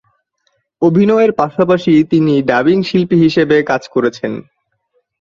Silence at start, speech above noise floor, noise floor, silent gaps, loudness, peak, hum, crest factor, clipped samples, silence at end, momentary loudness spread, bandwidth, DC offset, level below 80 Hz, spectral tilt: 0.8 s; 52 dB; -64 dBFS; none; -13 LUFS; -2 dBFS; none; 12 dB; under 0.1%; 0.8 s; 6 LU; 7.2 kHz; under 0.1%; -52 dBFS; -7.5 dB/octave